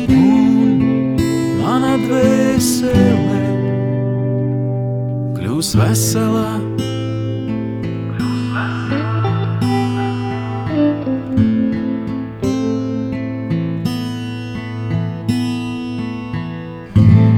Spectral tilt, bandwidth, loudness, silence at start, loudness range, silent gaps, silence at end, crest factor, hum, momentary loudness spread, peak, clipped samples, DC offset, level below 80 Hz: -6.5 dB/octave; 17 kHz; -17 LUFS; 0 s; 6 LU; none; 0 s; 16 dB; none; 10 LU; 0 dBFS; under 0.1%; under 0.1%; -40 dBFS